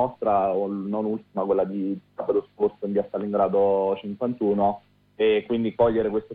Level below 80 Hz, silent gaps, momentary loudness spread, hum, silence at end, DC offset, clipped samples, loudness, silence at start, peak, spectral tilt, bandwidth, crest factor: -58 dBFS; none; 7 LU; none; 0 s; under 0.1%; under 0.1%; -24 LUFS; 0 s; -10 dBFS; -10 dB/octave; 4.5 kHz; 14 dB